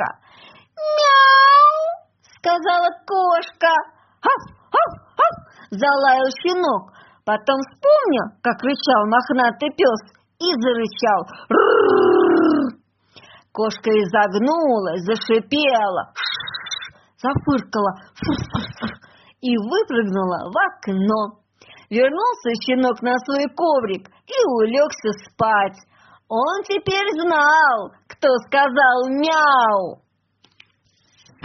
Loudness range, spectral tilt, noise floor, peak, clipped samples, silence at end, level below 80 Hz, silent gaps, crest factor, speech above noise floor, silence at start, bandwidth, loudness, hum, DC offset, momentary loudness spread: 6 LU; -2.5 dB/octave; -62 dBFS; -2 dBFS; under 0.1%; 1.5 s; -56 dBFS; none; 18 dB; 43 dB; 0 s; 6.4 kHz; -18 LUFS; none; under 0.1%; 12 LU